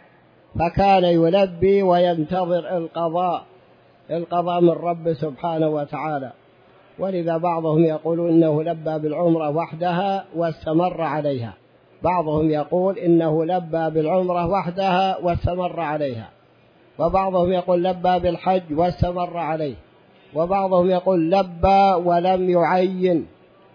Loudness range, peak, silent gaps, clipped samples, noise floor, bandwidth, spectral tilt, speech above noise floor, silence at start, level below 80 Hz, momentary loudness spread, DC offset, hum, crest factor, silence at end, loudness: 4 LU; -4 dBFS; none; under 0.1%; -54 dBFS; 5.4 kHz; -9 dB/octave; 34 dB; 0.55 s; -44 dBFS; 9 LU; under 0.1%; none; 16 dB; 0.5 s; -20 LUFS